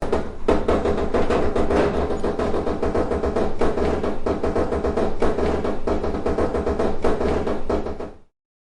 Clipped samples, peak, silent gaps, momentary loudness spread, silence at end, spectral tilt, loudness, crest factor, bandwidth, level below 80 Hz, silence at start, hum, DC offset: under 0.1%; -6 dBFS; none; 4 LU; 0.55 s; -7 dB/octave; -23 LUFS; 14 dB; 10 kHz; -30 dBFS; 0 s; none; under 0.1%